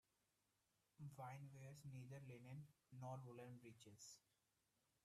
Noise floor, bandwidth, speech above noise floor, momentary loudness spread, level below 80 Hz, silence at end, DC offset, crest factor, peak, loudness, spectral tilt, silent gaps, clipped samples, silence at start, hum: -88 dBFS; 13.5 kHz; 29 dB; 7 LU; -90 dBFS; 0.85 s; under 0.1%; 18 dB; -42 dBFS; -60 LUFS; -6 dB/octave; none; under 0.1%; 1 s; none